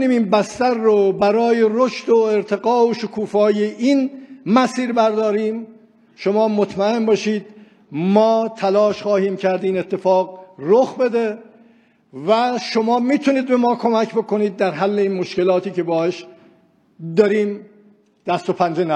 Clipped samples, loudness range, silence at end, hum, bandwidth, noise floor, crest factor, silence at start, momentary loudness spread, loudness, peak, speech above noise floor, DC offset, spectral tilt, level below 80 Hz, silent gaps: under 0.1%; 3 LU; 0 s; none; 9.8 kHz; -55 dBFS; 18 dB; 0 s; 9 LU; -18 LUFS; 0 dBFS; 38 dB; under 0.1%; -6 dB/octave; -66 dBFS; none